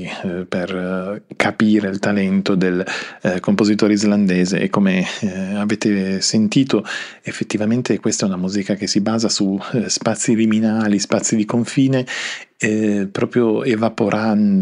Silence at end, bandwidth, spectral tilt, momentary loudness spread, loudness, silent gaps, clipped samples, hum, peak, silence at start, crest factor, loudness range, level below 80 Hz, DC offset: 0 s; 11 kHz; -5 dB/octave; 8 LU; -18 LUFS; none; under 0.1%; none; 0 dBFS; 0 s; 16 dB; 2 LU; -62 dBFS; under 0.1%